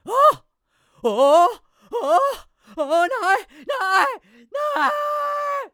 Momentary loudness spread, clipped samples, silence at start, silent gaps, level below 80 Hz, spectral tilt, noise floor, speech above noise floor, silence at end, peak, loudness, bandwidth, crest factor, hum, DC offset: 16 LU; under 0.1%; 0.05 s; none; -62 dBFS; -2.5 dB/octave; -66 dBFS; 46 dB; 0.05 s; -4 dBFS; -20 LUFS; over 20 kHz; 16 dB; none; under 0.1%